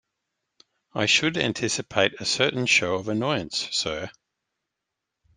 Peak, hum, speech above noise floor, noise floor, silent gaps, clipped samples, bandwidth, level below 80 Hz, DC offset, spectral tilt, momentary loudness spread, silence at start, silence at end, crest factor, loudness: -4 dBFS; none; 59 dB; -84 dBFS; none; under 0.1%; 11 kHz; -60 dBFS; under 0.1%; -3 dB/octave; 9 LU; 0.95 s; 1.25 s; 24 dB; -23 LUFS